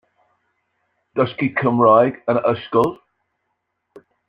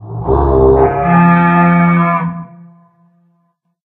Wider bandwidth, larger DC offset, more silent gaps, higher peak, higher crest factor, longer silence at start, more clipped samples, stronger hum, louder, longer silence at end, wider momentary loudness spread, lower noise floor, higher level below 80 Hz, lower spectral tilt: first, 5.4 kHz vs 3.8 kHz; neither; neither; about the same, -2 dBFS vs 0 dBFS; first, 20 dB vs 12 dB; first, 1.15 s vs 0 s; neither; neither; second, -18 LUFS vs -11 LUFS; about the same, 1.35 s vs 1.45 s; about the same, 9 LU vs 8 LU; first, -74 dBFS vs -62 dBFS; second, -62 dBFS vs -26 dBFS; second, -8.5 dB/octave vs -11.5 dB/octave